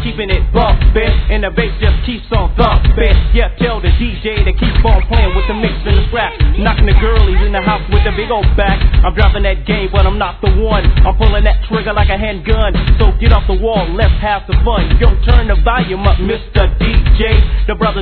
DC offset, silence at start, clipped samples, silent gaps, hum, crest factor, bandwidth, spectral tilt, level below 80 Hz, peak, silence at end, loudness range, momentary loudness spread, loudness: under 0.1%; 0 s; 0.6%; none; none; 10 dB; 4.5 kHz; -9.5 dB/octave; -12 dBFS; 0 dBFS; 0 s; 1 LU; 4 LU; -13 LUFS